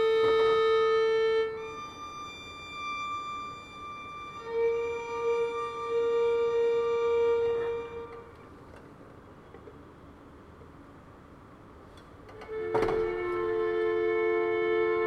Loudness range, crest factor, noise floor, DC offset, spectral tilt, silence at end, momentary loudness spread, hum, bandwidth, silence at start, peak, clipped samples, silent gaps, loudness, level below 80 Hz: 22 LU; 14 dB; -51 dBFS; under 0.1%; -5 dB/octave; 0 s; 25 LU; none; 7.6 kHz; 0 s; -16 dBFS; under 0.1%; none; -29 LUFS; -58 dBFS